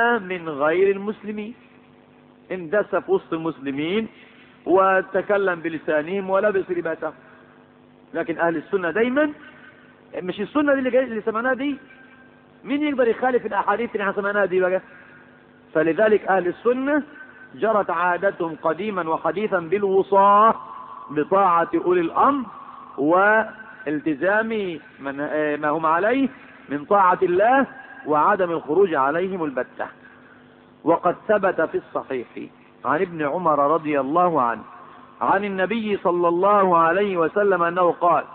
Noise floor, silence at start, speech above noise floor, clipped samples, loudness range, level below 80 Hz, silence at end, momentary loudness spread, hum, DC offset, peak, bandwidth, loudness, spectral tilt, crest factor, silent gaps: -51 dBFS; 0 s; 30 dB; under 0.1%; 5 LU; -64 dBFS; 0 s; 14 LU; none; under 0.1%; -6 dBFS; 4.2 kHz; -21 LUFS; -10.5 dB/octave; 16 dB; none